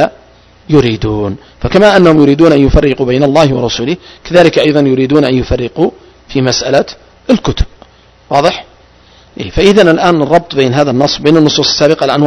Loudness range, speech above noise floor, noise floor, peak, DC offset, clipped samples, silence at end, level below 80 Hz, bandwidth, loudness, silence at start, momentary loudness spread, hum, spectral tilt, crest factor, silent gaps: 6 LU; 33 dB; -42 dBFS; 0 dBFS; under 0.1%; 3%; 0 s; -26 dBFS; 11 kHz; -9 LUFS; 0 s; 12 LU; none; -5.5 dB/octave; 10 dB; none